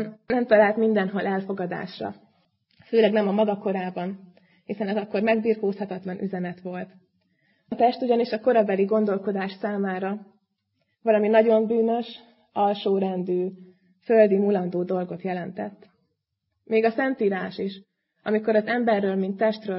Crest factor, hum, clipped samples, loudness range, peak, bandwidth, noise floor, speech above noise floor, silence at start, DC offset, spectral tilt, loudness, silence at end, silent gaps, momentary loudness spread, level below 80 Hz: 20 dB; none; under 0.1%; 4 LU; -4 dBFS; 5.8 kHz; -78 dBFS; 55 dB; 0 s; under 0.1%; -11 dB/octave; -24 LUFS; 0 s; none; 15 LU; -72 dBFS